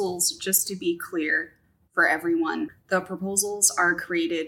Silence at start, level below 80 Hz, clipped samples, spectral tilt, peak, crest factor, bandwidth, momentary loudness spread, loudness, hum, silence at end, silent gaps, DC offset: 0 s; -68 dBFS; under 0.1%; -2 dB/octave; -4 dBFS; 20 dB; 17 kHz; 8 LU; -24 LUFS; none; 0 s; none; under 0.1%